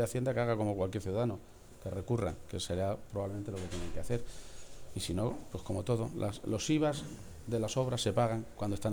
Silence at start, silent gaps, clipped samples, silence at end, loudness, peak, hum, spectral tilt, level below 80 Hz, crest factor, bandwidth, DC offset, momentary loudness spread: 0 s; none; under 0.1%; 0 s; -35 LUFS; -18 dBFS; none; -6 dB/octave; -52 dBFS; 16 dB; over 20 kHz; under 0.1%; 14 LU